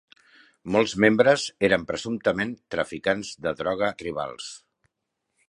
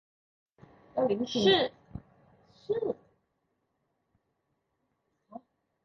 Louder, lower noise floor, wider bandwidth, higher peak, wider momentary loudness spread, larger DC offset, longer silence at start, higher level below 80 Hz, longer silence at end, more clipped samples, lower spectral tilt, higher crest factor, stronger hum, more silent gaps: first, -24 LUFS vs -29 LUFS; about the same, -81 dBFS vs -79 dBFS; first, 11 kHz vs 7.2 kHz; first, -2 dBFS vs -12 dBFS; second, 12 LU vs 26 LU; neither; second, 0.65 s vs 0.95 s; first, -58 dBFS vs -64 dBFS; first, 0.95 s vs 0.45 s; neither; about the same, -4.5 dB/octave vs -5 dB/octave; about the same, 24 dB vs 22 dB; neither; neither